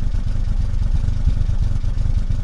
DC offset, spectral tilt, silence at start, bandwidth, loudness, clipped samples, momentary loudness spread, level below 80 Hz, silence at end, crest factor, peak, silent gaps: under 0.1%; -7.5 dB/octave; 0 s; 6.8 kHz; -23 LUFS; under 0.1%; 3 LU; -18 dBFS; 0 s; 12 dB; -6 dBFS; none